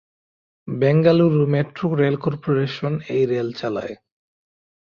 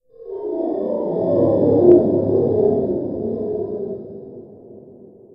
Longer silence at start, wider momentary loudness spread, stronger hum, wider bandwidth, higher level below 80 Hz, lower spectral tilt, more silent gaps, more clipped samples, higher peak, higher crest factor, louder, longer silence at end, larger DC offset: first, 0.65 s vs 0.2 s; second, 12 LU vs 19 LU; neither; first, 6.8 kHz vs 2 kHz; second, -58 dBFS vs -52 dBFS; second, -9 dB/octave vs -13 dB/octave; neither; neither; about the same, -2 dBFS vs 0 dBFS; about the same, 18 dB vs 18 dB; about the same, -20 LUFS vs -18 LUFS; first, 0.9 s vs 0.4 s; neither